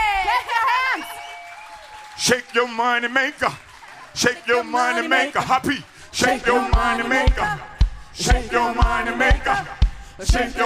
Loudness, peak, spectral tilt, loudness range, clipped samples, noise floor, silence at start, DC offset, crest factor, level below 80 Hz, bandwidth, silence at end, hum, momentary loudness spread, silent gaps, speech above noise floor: -20 LUFS; -2 dBFS; -4 dB/octave; 2 LU; under 0.1%; -42 dBFS; 0 s; under 0.1%; 20 dB; -26 dBFS; 15.5 kHz; 0 s; none; 14 LU; none; 22 dB